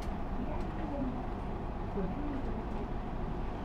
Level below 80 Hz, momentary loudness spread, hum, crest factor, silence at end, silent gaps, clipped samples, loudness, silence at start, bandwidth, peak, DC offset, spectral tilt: -38 dBFS; 3 LU; none; 14 dB; 0 s; none; under 0.1%; -39 LUFS; 0 s; 7 kHz; -22 dBFS; under 0.1%; -8.5 dB/octave